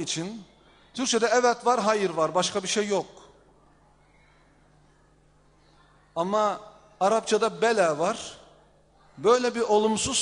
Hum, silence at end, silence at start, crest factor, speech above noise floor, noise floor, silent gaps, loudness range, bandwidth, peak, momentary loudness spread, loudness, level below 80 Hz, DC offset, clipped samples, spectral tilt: 50 Hz at -65 dBFS; 0 s; 0 s; 18 dB; 36 dB; -60 dBFS; none; 9 LU; 10.5 kHz; -8 dBFS; 15 LU; -25 LUFS; -62 dBFS; under 0.1%; under 0.1%; -3 dB/octave